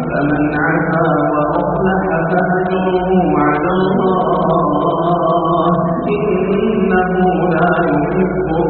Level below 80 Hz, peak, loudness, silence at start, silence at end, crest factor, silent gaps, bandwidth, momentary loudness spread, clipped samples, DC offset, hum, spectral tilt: -36 dBFS; -2 dBFS; -14 LUFS; 0 s; 0 s; 12 dB; none; 4.3 kHz; 2 LU; under 0.1%; under 0.1%; none; -6.5 dB/octave